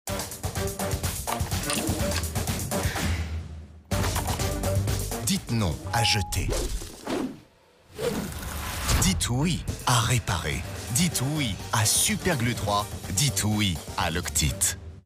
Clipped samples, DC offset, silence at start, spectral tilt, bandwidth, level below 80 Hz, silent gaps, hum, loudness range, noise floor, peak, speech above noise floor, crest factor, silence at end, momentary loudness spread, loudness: under 0.1%; under 0.1%; 0.05 s; -3.5 dB/octave; 16 kHz; -36 dBFS; none; none; 4 LU; -56 dBFS; -8 dBFS; 31 dB; 18 dB; 0.05 s; 9 LU; -26 LUFS